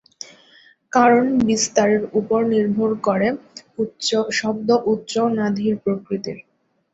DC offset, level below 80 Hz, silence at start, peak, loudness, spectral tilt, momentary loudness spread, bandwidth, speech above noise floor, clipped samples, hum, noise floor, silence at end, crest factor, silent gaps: under 0.1%; -56 dBFS; 0.2 s; -2 dBFS; -19 LUFS; -4.5 dB/octave; 15 LU; 8 kHz; 33 dB; under 0.1%; none; -52 dBFS; 0.55 s; 18 dB; none